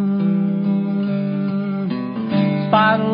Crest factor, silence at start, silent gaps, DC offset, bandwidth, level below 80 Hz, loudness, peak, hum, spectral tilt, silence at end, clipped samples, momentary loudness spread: 16 dB; 0 s; none; under 0.1%; 5.2 kHz; -62 dBFS; -19 LUFS; -2 dBFS; none; -12.5 dB/octave; 0 s; under 0.1%; 8 LU